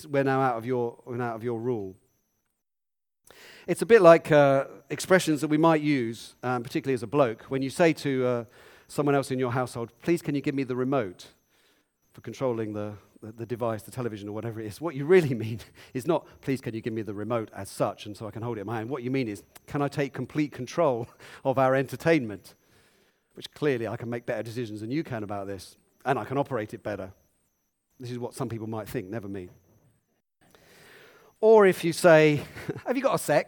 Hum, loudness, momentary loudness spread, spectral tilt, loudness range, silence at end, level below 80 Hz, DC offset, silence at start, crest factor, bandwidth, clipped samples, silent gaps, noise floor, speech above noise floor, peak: none; -26 LUFS; 17 LU; -6 dB/octave; 12 LU; 0.05 s; -66 dBFS; under 0.1%; 0 s; 24 dB; 19 kHz; under 0.1%; none; under -90 dBFS; over 64 dB; -2 dBFS